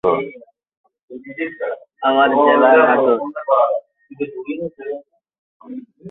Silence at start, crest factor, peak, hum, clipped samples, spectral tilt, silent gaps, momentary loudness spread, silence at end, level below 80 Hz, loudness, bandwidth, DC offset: 0.05 s; 16 dB; -2 dBFS; none; under 0.1%; -8.5 dB/octave; 0.77-0.84 s, 1.03-1.08 s, 5.38-5.60 s; 23 LU; 0 s; -62 dBFS; -16 LUFS; 4.1 kHz; under 0.1%